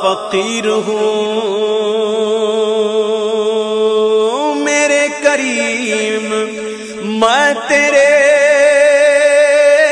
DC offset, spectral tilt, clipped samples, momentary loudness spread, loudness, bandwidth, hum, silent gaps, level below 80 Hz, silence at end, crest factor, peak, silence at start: under 0.1%; -2.5 dB/octave; under 0.1%; 7 LU; -12 LUFS; 10 kHz; none; none; -58 dBFS; 0 s; 12 dB; 0 dBFS; 0 s